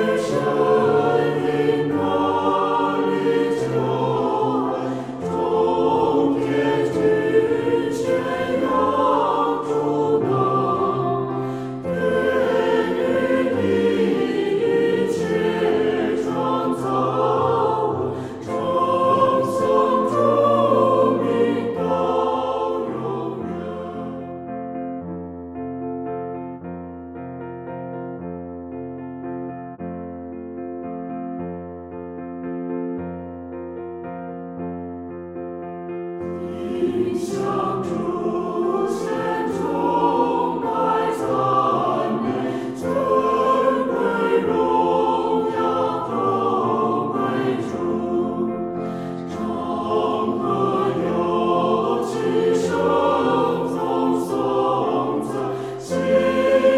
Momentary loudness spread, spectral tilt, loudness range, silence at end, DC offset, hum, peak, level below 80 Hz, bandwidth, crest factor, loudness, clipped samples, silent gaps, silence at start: 14 LU; -7 dB/octave; 12 LU; 0 s; under 0.1%; none; -4 dBFS; -54 dBFS; 13 kHz; 16 dB; -21 LUFS; under 0.1%; none; 0 s